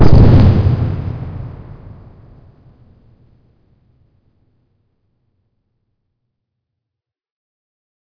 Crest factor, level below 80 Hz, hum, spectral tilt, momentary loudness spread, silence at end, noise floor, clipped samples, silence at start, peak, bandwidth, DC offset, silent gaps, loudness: 16 dB; -24 dBFS; none; -10 dB/octave; 29 LU; 6.4 s; -83 dBFS; under 0.1%; 0 s; 0 dBFS; 5.4 kHz; under 0.1%; none; -12 LUFS